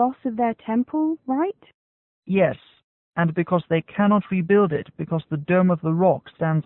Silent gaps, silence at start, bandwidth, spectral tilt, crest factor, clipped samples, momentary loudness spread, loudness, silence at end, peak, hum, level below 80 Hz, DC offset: 1.74-2.22 s, 2.84-3.11 s; 0 s; 4 kHz; -12.5 dB/octave; 16 dB; under 0.1%; 8 LU; -22 LUFS; 0.05 s; -6 dBFS; none; -60 dBFS; under 0.1%